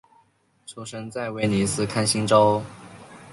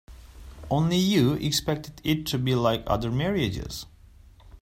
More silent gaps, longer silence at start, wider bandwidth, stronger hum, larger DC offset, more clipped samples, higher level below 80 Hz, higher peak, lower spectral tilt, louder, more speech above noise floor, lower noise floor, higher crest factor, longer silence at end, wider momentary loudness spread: neither; first, 0.7 s vs 0.1 s; second, 11.5 kHz vs 16 kHz; neither; neither; neither; second, -54 dBFS vs -44 dBFS; first, -4 dBFS vs -8 dBFS; about the same, -4.5 dB/octave vs -5.5 dB/octave; first, -22 LUFS vs -25 LUFS; first, 40 dB vs 26 dB; first, -62 dBFS vs -51 dBFS; about the same, 20 dB vs 18 dB; about the same, 0 s vs 0.05 s; first, 23 LU vs 14 LU